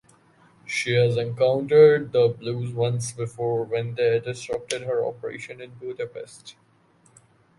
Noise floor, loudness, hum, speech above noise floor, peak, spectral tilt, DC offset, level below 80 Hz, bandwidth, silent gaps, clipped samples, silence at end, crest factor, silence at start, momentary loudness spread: -60 dBFS; -23 LUFS; none; 37 dB; -4 dBFS; -5.5 dB/octave; under 0.1%; -64 dBFS; 11.5 kHz; none; under 0.1%; 1.05 s; 20 dB; 0.65 s; 20 LU